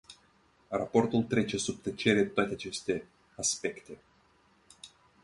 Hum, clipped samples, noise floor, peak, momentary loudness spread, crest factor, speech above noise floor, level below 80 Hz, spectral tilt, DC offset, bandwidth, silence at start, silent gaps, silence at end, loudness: none; under 0.1%; -66 dBFS; -10 dBFS; 24 LU; 24 dB; 35 dB; -62 dBFS; -4 dB/octave; under 0.1%; 11.5 kHz; 0.1 s; none; 0.35 s; -31 LUFS